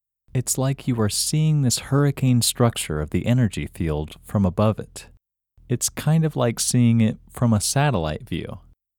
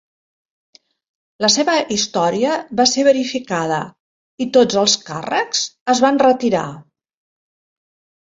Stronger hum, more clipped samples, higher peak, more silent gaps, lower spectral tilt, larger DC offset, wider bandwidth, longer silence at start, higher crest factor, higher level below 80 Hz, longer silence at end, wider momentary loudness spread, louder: neither; neither; second, -4 dBFS vs 0 dBFS; second, none vs 4.00-4.38 s, 5.81-5.86 s; first, -5 dB/octave vs -3 dB/octave; neither; first, 19 kHz vs 7.8 kHz; second, 0.35 s vs 1.4 s; about the same, 18 dB vs 18 dB; first, -42 dBFS vs -60 dBFS; second, 0.4 s vs 1.45 s; about the same, 10 LU vs 8 LU; second, -22 LUFS vs -16 LUFS